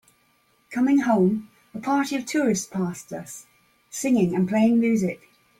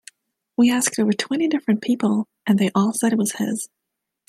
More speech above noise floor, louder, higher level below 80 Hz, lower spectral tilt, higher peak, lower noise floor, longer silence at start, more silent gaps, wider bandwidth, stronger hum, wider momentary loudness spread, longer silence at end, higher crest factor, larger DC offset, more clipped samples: about the same, 42 dB vs 45 dB; about the same, -23 LUFS vs -21 LUFS; about the same, -64 dBFS vs -68 dBFS; first, -6 dB/octave vs -4.5 dB/octave; second, -8 dBFS vs -4 dBFS; about the same, -64 dBFS vs -65 dBFS; about the same, 0.7 s vs 0.6 s; neither; first, 16 kHz vs 14 kHz; neither; first, 17 LU vs 8 LU; second, 0.45 s vs 0.6 s; about the same, 16 dB vs 16 dB; neither; neither